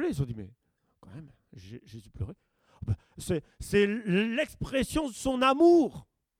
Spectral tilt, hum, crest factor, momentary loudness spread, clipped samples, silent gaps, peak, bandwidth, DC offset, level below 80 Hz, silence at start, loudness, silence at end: -6 dB/octave; none; 18 dB; 26 LU; under 0.1%; none; -12 dBFS; 15.5 kHz; under 0.1%; -50 dBFS; 0 s; -28 LUFS; 0.4 s